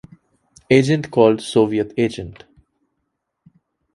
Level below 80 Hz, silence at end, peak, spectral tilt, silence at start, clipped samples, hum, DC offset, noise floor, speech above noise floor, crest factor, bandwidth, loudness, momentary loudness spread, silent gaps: -52 dBFS; 1.65 s; 0 dBFS; -6.5 dB/octave; 0.7 s; under 0.1%; none; under 0.1%; -75 dBFS; 58 dB; 20 dB; 11.5 kHz; -17 LUFS; 10 LU; none